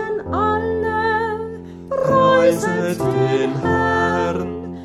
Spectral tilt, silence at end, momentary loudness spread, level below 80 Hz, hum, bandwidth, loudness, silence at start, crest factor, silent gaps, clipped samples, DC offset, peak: -6 dB/octave; 0 s; 12 LU; -44 dBFS; none; 15.5 kHz; -18 LUFS; 0 s; 14 dB; none; under 0.1%; under 0.1%; -4 dBFS